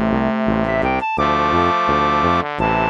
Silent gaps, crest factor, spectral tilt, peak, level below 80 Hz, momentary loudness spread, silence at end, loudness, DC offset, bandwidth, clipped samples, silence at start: none; 14 dB; -6.5 dB/octave; -2 dBFS; -36 dBFS; 3 LU; 0 s; -17 LUFS; under 0.1%; 7.4 kHz; under 0.1%; 0 s